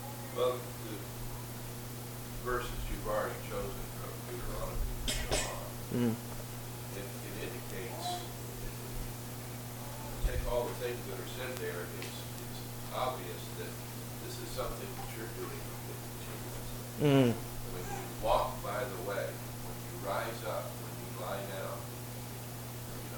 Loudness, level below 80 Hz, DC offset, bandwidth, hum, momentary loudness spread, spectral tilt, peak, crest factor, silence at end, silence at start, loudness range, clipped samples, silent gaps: -38 LUFS; -46 dBFS; under 0.1%; 19 kHz; none; 9 LU; -5 dB/octave; -14 dBFS; 24 dB; 0 s; 0 s; 7 LU; under 0.1%; none